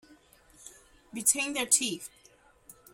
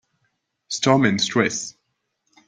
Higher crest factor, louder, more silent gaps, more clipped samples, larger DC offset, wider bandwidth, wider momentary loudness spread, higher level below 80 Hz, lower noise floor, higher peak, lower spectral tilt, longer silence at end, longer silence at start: first, 26 dB vs 20 dB; second, -26 LUFS vs -20 LUFS; neither; neither; neither; first, 16.5 kHz vs 9.6 kHz; first, 25 LU vs 13 LU; second, -68 dBFS vs -62 dBFS; second, -61 dBFS vs -74 dBFS; second, -8 dBFS vs -2 dBFS; second, 0 dB/octave vs -4 dB/octave; second, 0.2 s vs 0.75 s; about the same, 0.6 s vs 0.7 s